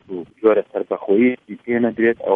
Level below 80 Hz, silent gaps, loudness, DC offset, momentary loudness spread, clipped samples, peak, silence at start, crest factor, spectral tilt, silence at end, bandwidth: -62 dBFS; none; -19 LUFS; under 0.1%; 9 LU; under 0.1%; -2 dBFS; 0.1 s; 16 dB; -9.5 dB/octave; 0 s; 3.7 kHz